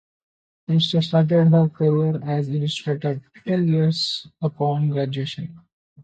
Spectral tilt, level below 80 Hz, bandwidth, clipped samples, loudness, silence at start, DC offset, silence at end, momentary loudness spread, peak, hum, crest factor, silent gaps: -7.5 dB/octave; -64 dBFS; 8.6 kHz; under 0.1%; -21 LUFS; 0.7 s; under 0.1%; 0 s; 11 LU; -6 dBFS; none; 16 dB; 5.72-5.96 s